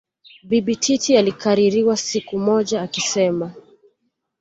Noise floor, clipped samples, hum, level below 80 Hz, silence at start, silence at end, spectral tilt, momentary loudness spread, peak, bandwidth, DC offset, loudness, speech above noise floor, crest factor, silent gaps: -71 dBFS; under 0.1%; none; -60 dBFS; 0.45 s; 0.8 s; -4 dB/octave; 6 LU; -4 dBFS; 8 kHz; under 0.1%; -19 LUFS; 53 dB; 16 dB; none